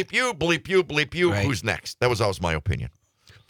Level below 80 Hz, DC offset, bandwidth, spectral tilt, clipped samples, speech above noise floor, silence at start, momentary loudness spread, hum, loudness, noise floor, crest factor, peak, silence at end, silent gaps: -46 dBFS; under 0.1%; 18.5 kHz; -5 dB/octave; under 0.1%; 32 dB; 0 s; 6 LU; none; -24 LUFS; -56 dBFS; 18 dB; -6 dBFS; 0.6 s; none